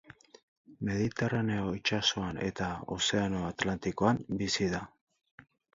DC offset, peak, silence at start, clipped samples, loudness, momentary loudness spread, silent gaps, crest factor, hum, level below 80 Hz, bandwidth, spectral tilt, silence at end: under 0.1%; -12 dBFS; 0.1 s; under 0.1%; -32 LUFS; 7 LU; 0.43-0.65 s; 22 dB; none; -56 dBFS; 8 kHz; -4.5 dB/octave; 0.9 s